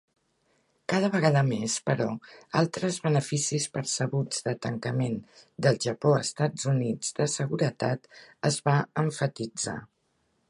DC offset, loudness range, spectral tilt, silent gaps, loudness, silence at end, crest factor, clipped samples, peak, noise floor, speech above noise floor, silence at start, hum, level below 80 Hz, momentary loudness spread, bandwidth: under 0.1%; 2 LU; -5 dB/octave; none; -28 LUFS; 0.65 s; 20 dB; under 0.1%; -8 dBFS; -73 dBFS; 45 dB; 0.9 s; none; -68 dBFS; 8 LU; 11.5 kHz